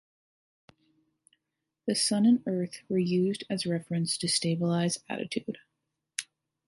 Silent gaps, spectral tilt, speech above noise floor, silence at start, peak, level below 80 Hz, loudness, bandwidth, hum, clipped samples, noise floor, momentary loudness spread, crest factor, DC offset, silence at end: none; -4.5 dB/octave; 57 dB; 1.85 s; -10 dBFS; -74 dBFS; -29 LUFS; 11.5 kHz; none; under 0.1%; -85 dBFS; 14 LU; 20 dB; under 0.1%; 0.45 s